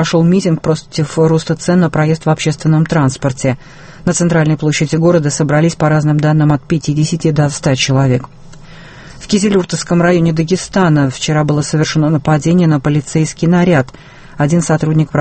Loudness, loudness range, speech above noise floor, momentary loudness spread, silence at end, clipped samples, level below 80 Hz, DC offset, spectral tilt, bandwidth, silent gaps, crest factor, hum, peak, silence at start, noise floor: -13 LUFS; 2 LU; 22 dB; 5 LU; 0 s; under 0.1%; -40 dBFS; under 0.1%; -6 dB/octave; 8.8 kHz; none; 12 dB; none; 0 dBFS; 0 s; -34 dBFS